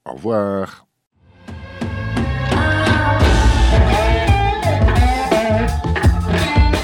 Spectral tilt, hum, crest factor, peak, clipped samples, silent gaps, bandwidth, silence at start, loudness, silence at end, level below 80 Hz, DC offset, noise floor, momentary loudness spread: -6 dB/octave; none; 12 dB; -4 dBFS; under 0.1%; 1.07-1.11 s; 16.5 kHz; 0.05 s; -16 LUFS; 0 s; -20 dBFS; under 0.1%; -36 dBFS; 11 LU